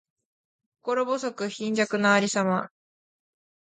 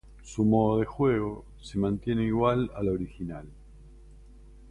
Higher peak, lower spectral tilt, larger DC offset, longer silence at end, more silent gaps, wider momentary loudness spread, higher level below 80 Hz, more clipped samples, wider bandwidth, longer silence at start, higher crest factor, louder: about the same, -8 dBFS vs -10 dBFS; second, -4.5 dB/octave vs -8 dB/octave; neither; first, 1 s vs 0 s; neither; second, 10 LU vs 15 LU; second, -76 dBFS vs -48 dBFS; neither; about the same, 9.6 kHz vs 10.5 kHz; first, 0.85 s vs 0.05 s; about the same, 20 dB vs 18 dB; first, -25 LUFS vs -28 LUFS